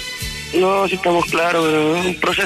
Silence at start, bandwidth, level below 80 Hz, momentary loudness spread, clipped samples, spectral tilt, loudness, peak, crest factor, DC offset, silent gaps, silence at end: 0 s; 14 kHz; -42 dBFS; 5 LU; under 0.1%; -4 dB/octave; -17 LUFS; -6 dBFS; 12 dB; under 0.1%; none; 0 s